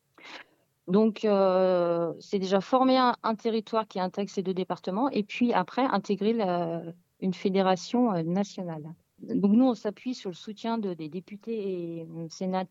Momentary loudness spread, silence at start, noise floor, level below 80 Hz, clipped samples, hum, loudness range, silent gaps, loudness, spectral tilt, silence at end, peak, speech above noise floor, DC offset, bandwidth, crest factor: 15 LU; 0.25 s; -54 dBFS; -80 dBFS; under 0.1%; none; 4 LU; none; -28 LUFS; -6.5 dB/octave; 0.05 s; -10 dBFS; 26 dB; under 0.1%; 7.8 kHz; 18 dB